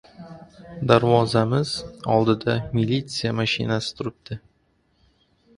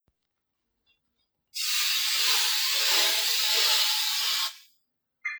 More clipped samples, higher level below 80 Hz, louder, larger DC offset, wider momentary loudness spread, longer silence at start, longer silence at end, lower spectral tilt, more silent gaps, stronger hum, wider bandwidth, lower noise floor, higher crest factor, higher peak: neither; first, -52 dBFS vs -90 dBFS; about the same, -22 LUFS vs -22 LUFS; neither; first, 19 LU vs 9 LU; second, 0.2 s vs 1.55 s; first, 1.2 s vs 0 s; first, -6 dB/octave vs 5.5 dB/octave; neither; neither; second, 11.5 kHz vs over 20 kHz; second, -65 dBFS vs -81 dBFS; about the same, 22 dB vs 18 dB; first, -2 dBFS vs -10 dBFS